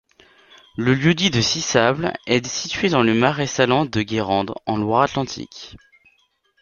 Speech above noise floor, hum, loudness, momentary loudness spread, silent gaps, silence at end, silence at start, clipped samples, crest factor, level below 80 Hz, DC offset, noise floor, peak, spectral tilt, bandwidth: 44 dB; none; -19 LUFS; 11 LU; none; 0.85 s; 0.75 s; under 0.1%; 20 dB; -52 dBFS; under 0.1%; -63 dBFS; -2 dBFS; -4.5 dB/octave; 7.4 kHz